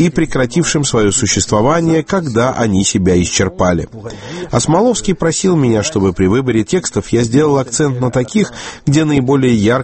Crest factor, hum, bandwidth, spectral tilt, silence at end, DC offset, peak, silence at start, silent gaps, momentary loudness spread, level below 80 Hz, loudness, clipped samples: 12 dB; none; 8.8 kHz; -5 dB/octave; 0 s; under 0.1%; 0 dBFS; 0 s; none; 4 LU; -36 dBFS; -13 LUFS; under 0.1%